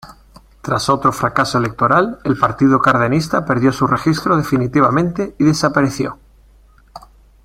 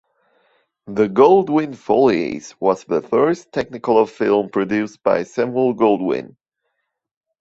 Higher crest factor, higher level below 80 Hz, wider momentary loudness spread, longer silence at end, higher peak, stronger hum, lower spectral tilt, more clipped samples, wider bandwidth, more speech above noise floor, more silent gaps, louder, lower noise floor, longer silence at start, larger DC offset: about the same, 16 dB vs 18 dB; first, -44 dBFS vs -58 dBFS; second, 6 LU vs 10 LU; second, 0.45 s vs 1.15 s; about the same, 0 dBFS vs -2 dBFS; neither; about the same, -6 dB/octave vs -6.5 dB/octave; neither; first, 16 kHz vs 7.8 kHz; second, 33 dB vs 58 dB; neither; first, -15 LUFS vs -18 LUFS; second, -48 dBFS vs -75 dBFS; second, 0.05 s vs 0.85 s; neither